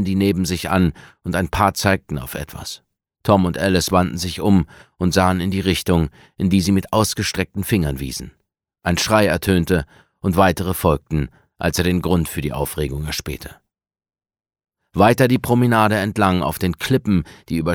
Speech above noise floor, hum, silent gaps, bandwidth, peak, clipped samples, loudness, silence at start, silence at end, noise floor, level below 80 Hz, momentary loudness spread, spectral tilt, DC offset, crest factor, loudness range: 59 dB; none; none; 19 kHz; 0 dBFS; under 0.1%; -19 LUFS; 0 s; 0 s; -78 dBFS; -38 dBFS; 12 LU; -5.5 dB/octave; under 0.1%; 18 dB; 4 LU